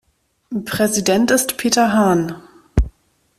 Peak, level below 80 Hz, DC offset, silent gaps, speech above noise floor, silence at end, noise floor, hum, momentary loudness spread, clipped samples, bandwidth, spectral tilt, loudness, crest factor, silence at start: -2 dBFS; -30 dBFS; under 0.1%; none; 37 dB; 0.5 s; -53 dBFS; none; 13 LU; under 0.1%; 16 kHz; -4 dB/octave; -17 LUFS; 16 dB; 0.5 s